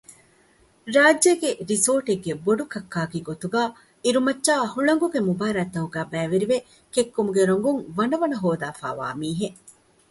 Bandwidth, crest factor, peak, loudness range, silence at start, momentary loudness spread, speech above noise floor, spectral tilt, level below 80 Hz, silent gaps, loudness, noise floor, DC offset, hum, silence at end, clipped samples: 12 kHz; 20 dB; -4 dBFS; 2 LU; 0.1 s; 10 LU; 36 dB; -4 dB/octave; -62 dBFS; none; -23 LUFS; -59 dBFS; under 0.1%; none; 0.6 s; under 0.1%